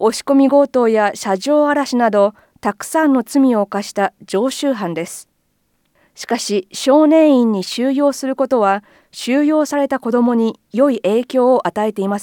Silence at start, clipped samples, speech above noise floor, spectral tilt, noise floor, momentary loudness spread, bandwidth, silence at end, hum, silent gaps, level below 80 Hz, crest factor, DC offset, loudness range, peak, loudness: 0 s; under 0.1%; 49 dB; -5 dB/octave; -64 dBFS; 10 LU; 17.5 kHz; 0 s; none; none; -66 dBFS; 14 dB; under 0.1%; 4 LU; -2 dBFS; -16 LUFS